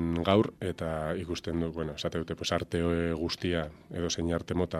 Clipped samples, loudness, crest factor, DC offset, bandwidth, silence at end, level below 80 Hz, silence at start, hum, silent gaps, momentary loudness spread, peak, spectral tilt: under 0.1%; -31 LUFS; 22 dB; under 0.1%; 13.5 kHz; 0 s; -48 dBFS; 0 s; none; none; 8 LU; -8 dBFS; -5.5 dB/octave